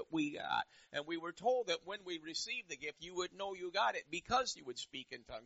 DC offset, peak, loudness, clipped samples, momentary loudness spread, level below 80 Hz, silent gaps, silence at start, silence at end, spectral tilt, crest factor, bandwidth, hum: under 0.1%; -22 dBFS; -40 LUFS; under 0.1%; 9 LU; -72 dBFS; none; 0 s; 0 s; -1 dB/octave; 20 dB; 8 kHz; none